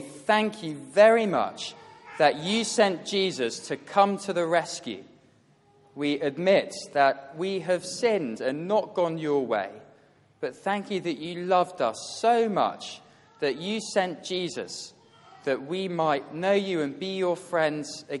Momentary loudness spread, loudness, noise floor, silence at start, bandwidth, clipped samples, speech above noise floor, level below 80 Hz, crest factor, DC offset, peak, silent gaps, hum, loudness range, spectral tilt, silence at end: 12 LU; -26 LUFS; -61 dBFS; 0 s; 11.5 kHz; under 0.1%; 35 dB; -76 dBFS; 22 dB; under 0.1%; -6 dBFS; none; none; 5 LU; -4 dB/octave; 0 s